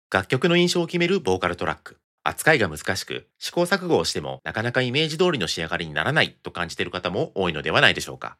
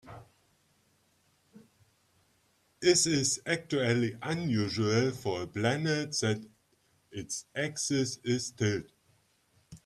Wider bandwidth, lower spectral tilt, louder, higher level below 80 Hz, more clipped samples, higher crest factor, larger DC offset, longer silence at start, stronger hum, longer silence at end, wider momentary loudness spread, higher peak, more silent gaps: first, 15.5 kHz vs 13.5 kHz; about the same, -4.5 dB/octave vs -4 dB/octave; first, -23 LUFS vs -30 LUFS; first, -56 dBFS vs -66 dBFS; neither; about the same, 24 dB vs 22 dB; neither; about the same, 0.1 s vs 0.05 s; neither; about the same, 0.05 s vs 0.1 s; about the same, 10 LU vs 12 LU; first, 0 dBFS vs -10 dBFS; first, 2.04-2.18 s vs none